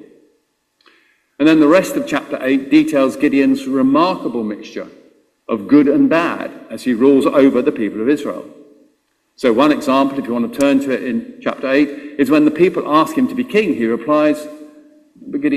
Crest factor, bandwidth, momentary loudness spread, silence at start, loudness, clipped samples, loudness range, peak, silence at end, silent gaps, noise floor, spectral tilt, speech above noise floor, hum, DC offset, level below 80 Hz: 16 dB; 14 kHz; 12 LU; 1.4 s; -15 LUFS; under 0.1%; 3 LU; 0 dBFS; 0 s; none; -63 dBFS; -6 dB/octave; 49 dB; none; under 0.1%; -58 dBFS